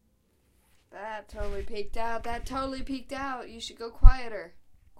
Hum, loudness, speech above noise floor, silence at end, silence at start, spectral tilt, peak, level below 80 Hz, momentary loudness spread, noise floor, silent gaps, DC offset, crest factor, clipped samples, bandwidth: none; -32 LUFS; 44 dB; 0.4 s; 0.95 s; -6 dB/octave; -2 dBFS; -28 dBFS; 15 LU; -68 dBFS; none; under 0.1%; 24 dB; under 0.1%; 9 kHz